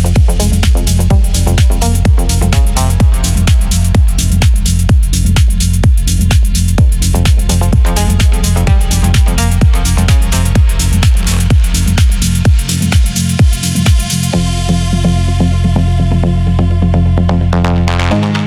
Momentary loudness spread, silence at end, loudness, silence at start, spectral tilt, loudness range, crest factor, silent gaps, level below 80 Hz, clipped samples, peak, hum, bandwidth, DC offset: 1 LU; 0 s; -11 LUFS; 0 s; -5 dB/octave; 1 LU; 8 dB; none; -12 dBFS; under 0.1%; 0 dBFS; none; 16 kHz; under 0.1%